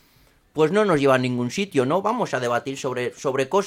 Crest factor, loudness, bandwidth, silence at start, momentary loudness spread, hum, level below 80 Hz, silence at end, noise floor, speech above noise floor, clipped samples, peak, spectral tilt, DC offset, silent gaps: 18 dB; -22 LUFS; 15.5 kHz; 0.55 s; 8 LU; none; -60 dBFS; 0 s; -58 dBFS; 36 dB; under 0.1%; -4 dBFS; -5.5 dB/octave; under 0.1%; none